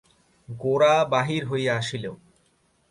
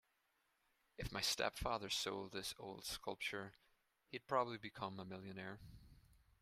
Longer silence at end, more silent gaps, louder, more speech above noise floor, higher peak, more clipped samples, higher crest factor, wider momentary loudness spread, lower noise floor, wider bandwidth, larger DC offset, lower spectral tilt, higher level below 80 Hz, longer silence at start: first, 0.75 s vs 0.25 s; neither; first, -23 LUFS vs -44 LUFS; first, 42 dB vs 37 dB; first, -8 dBFS vs -24 dBFS; neither; second, 18 dB vs 24 dB; first, 16 LU vs 13 LU; second, -65 dBFS vs -83 dBFS; second, 11.5 kHz vs 15.5 kHz; neither; first, -5.5 dB/octave vs -3 dB/octave; about the same, -62 dBFS vs -64 dBFS; second, 0.5 s vs 1 s